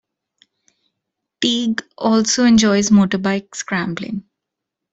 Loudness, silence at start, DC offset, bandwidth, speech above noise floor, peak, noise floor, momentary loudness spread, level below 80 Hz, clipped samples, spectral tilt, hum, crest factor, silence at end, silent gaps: -17 LUFS; 1.4 s; under 0.1%; 8 kHz; 65 dB; -2 dBFS; -81 dBFS; 12 LU; -52 dBFS; under 0.1%; -4 dB/octave; none; 16 dB; 0.7 s; none